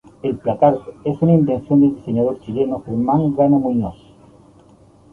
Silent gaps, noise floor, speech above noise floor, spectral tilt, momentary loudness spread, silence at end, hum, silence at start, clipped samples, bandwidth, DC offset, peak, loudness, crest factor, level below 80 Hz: none; -48 dBFS; 32 dB; -11 dB/octave; 8 LU; 1.2 s; none; 0.25 s; under 0.1%; 3.6 kHz; under 0.1%; -2 dBFS; -18 LUFS; 16 dB; -48 dBFS